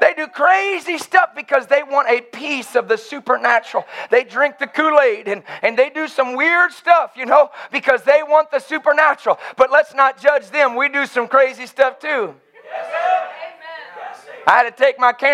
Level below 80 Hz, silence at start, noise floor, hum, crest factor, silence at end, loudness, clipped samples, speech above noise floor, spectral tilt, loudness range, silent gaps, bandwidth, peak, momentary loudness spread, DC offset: -72 dBFS; 0 s; -35 dBFS; none; 16 dB; 0 s; -16 LUFS; under 0.1%; 19 dB; -3 dB/octave; 4 LU; none; 13 kHz; 0 dBFS; 11 LU; under 0.1%